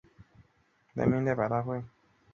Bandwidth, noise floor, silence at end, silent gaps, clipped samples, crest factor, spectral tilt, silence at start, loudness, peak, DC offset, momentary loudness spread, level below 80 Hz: 7 kHz; -69 dBFS; 0.45 s; none; under 0.1%; 20 dB; -10 dB/octave; 0.2 s; -31 LUFS; -12 dBFS; under 0.1%; 13 LU; -60 dBFS